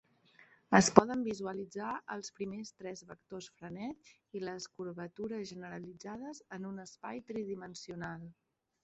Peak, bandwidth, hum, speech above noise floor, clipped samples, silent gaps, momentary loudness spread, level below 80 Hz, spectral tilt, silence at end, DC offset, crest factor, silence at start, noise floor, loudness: -2 dBFS; 8.2 kHz; none; 29 dB; under 0.1%; none; 20 LU; -70 dBFS; -4.5 dB/octave; 0.5 s; under 0.1%; 34 dB; 0.7 s; -65 dBFS; -36 LUFS